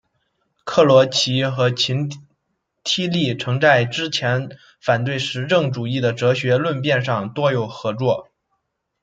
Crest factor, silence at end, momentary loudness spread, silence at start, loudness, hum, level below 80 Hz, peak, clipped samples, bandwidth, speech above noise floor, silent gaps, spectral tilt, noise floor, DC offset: 18 dB; 0.8 s; 10 LU; 0.65 s; -19 LUFS; none; -62 dBFS; -2 dBFS; under 0.1%; 9 kHz; 54 dB; none; -5 dB/octave; -73 dBFS; under 0.1%